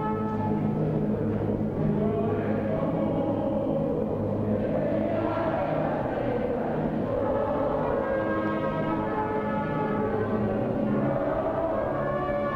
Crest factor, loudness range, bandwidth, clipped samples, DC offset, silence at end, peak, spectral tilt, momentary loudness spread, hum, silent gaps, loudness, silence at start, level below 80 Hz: 14 dB; 0 LU; 5.6 kHz; under 0.1%; under 0.1%; 0 s; -12 dBFS; -10 dB/octave; 2 LU; none; none; -27 LUFS; 0 s; -46 dBFS